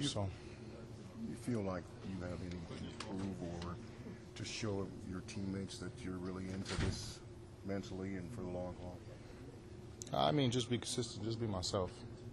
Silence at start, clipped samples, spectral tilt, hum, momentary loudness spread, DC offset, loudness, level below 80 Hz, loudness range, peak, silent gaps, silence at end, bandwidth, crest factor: 0 s; under 0.1%; -5 dB/octave; none; 14 LU; under 0.1%; -42 LUFS; -58 dBFS; 6 LU; -20 dBFS; none; 0 s; 12 kHz; 22 dB